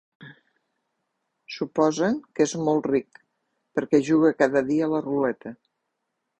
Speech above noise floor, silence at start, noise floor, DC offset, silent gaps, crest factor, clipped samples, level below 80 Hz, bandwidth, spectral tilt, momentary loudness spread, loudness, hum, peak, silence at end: 57 dB; 0.2 s; -79 dBFS; under 0.1%; none; 20 dB; under 0.1%; -66 dBFS; 8.8 kHz; -6 dB/octave; 12 LU; -23 LUFS; none; -6 dBFS; 0.85 s